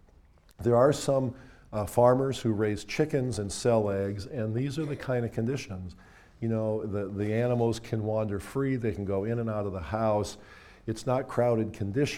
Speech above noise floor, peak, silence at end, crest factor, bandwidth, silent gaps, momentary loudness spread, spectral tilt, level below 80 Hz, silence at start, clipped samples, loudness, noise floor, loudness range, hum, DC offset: 30 dB; -8 dBFS; 0 s; 20 dB; 15.5 kHz; none; 11 LU; -6.5 dB/octave; -54 dBFS; 0.6 s; under 0.1%; -29 LUFS; -58 dBFS; 4 LU; none; under 0.1%